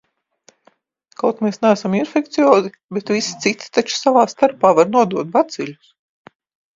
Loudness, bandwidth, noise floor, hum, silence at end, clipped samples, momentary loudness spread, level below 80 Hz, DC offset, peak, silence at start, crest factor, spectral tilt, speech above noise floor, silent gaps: -17 LUFS; 7.8 kHz; -58 dBFS; none; 1 s; under 0.1%; 8 LU; -66 dBFS; under 0.1%; 0 dBFS; 1.25 s; 18 dB; -4.5 dB/octave; 41 dB; 2.84-2.89 s